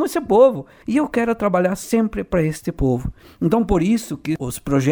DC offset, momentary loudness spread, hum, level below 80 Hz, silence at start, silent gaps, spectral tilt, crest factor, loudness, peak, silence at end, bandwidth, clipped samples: under 0.1%; 10 LU; none; -36 dBFS; 0 s; none; -6.5 dB/octave; 16 dB; -19 LUFS; -2 dBFS; 0 s; over 20 kHz; under 0.1%